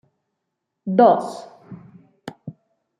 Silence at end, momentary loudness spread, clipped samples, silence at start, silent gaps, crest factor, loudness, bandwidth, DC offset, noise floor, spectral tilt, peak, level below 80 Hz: 0.5 s; 26 LU; under 0.1%; 0.85 s; none; 20 dB; -17 LUFS; 11 kHz; under 0.1%; -79 dBFS; -7.5 dB/octave; -2 dBFS; -72 dBFS